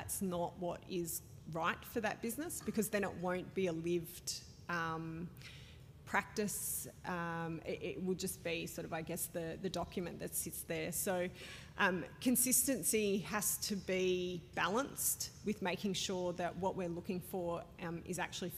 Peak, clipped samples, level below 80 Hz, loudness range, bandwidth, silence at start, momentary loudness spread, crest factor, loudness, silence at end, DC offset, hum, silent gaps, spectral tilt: -18 dBFS; under 0.1%; -64 dBFS; 6 LU; 15.5 kHz; 0 s; 8 LU; 20 dB; -38 LUFS; 0 s; under 0.1%; none; none; -3.5 dB/octave